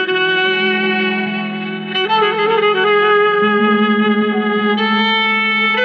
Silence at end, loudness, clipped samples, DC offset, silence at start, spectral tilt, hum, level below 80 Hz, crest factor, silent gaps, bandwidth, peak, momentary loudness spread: 0 s; -14 LUFS; under 0.1%; under 0.1%; 0 s; -6.5 dB/octave; none; -66 dBFS; 12 dB; none; 6 kHz; -2 dBFS; 6 LU